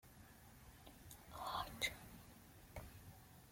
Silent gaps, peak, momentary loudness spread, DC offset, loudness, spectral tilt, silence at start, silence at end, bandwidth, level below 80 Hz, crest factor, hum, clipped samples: none; -26 dBFS; 18 LU; under 0.1%; -49 LUFS; -2.5 dB/octave; 0.05 s; 0 s; 16.5 kHz; -66 dBFS; 26 dB; none; under 0.1%